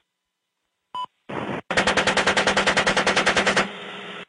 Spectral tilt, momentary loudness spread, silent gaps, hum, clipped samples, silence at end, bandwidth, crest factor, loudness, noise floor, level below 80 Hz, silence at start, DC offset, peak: -2.5 dB/octave; 15 LU; none; none; under 0.1%; 0.05 s; 10.5 kHz; 14 dB; -20 LUFS; -79 dBFS; -50 dBFS; 0.95 s; under 0.1%; -8 dBFS